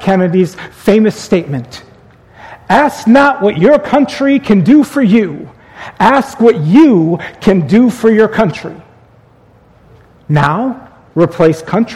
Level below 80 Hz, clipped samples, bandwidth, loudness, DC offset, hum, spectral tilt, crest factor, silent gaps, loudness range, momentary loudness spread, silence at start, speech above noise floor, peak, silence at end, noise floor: -42 dBFS; 0.5%; 13.5 kHz; -10 LUFS; under 0.1%; none; -7 dB/octave; 10 dB; none; 5 LU; 13 LU; 0 s; 35 dB; 0 dBFS; 0 s; -45 dBFS